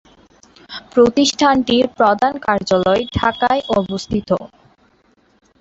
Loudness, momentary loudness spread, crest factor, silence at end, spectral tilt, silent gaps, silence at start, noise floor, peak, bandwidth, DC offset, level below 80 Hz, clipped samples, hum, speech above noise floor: -16 LUFS; 9 LU; 16 dB; 1.15 s; -4.5 dB/octave; none; 0.7 s; -56 dBFS; -2 dBFS; 8 kHz; under 0.1%; -42 dBFS; under 0.1%; none; 41 dB